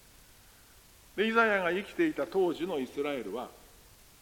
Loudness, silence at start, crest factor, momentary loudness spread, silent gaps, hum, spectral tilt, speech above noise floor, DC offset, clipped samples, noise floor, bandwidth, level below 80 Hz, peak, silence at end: -30 LUFS; 1.15 s; 22 dB; 14 LU; none; none; -5 dB/octave; 27 dB; under 0.1%; under 0.1%; -58 dBFS; 17 kHz; -64 dBFS; -10 dBFS; 0.65 s